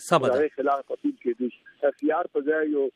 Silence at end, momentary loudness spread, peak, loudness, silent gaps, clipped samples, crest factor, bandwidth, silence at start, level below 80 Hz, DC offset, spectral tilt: 0.05 s; 7 LU; -6 dBFS; -26 LUFS; none; under 0.1%; 20 dB; 14 kHz; 0 s; -78 dBFS; under 0.1%; -5.5 dB/octave